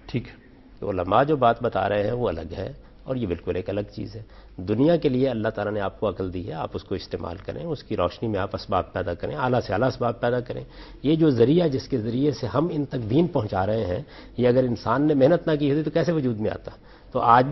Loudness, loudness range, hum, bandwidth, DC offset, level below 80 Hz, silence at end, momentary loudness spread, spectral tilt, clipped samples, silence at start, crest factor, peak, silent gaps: -24 LUFS; 6 LU; none; 6.2 kHz; under 0.1%; -48 dBFS; 0 s; 15 LU; -8.5 dB/octave; under 0.1%; 0.05 s; 22 dB; -2 dBFS; none